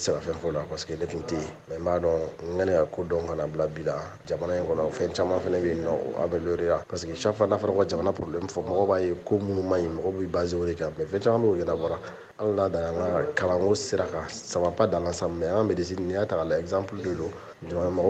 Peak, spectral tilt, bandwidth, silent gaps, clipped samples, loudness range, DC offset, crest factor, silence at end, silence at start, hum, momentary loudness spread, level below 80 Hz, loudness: -8 dBFS; -6 dB/octave; 9 kHz; none; under 0.1%; 2 LU; under 0.1%; 18 dB; 0 s; 0 s; none; 8 LU; -52 dBFS; -27 LUFS